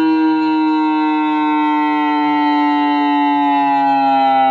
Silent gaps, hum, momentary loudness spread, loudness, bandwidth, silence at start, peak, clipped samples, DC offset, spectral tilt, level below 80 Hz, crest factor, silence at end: none; none; 2 LU; -14 LUFS; 5.2 kHz; 0 s; -6 dBFS; under 0.1%; under 0.1%; -6 dB/octave; -66 dBFS; 8 dB; 0 s